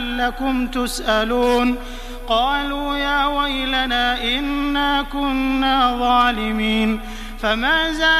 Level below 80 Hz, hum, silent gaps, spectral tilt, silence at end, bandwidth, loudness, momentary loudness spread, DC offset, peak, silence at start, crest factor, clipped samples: -32 dBFS; none; none; -3.5 dB/octave; 0 s; 15.5 kHz; -19 LUFS; 6 LU; under 0.1%; -4 dBFS; 0 s; 16 dB; under 0.1%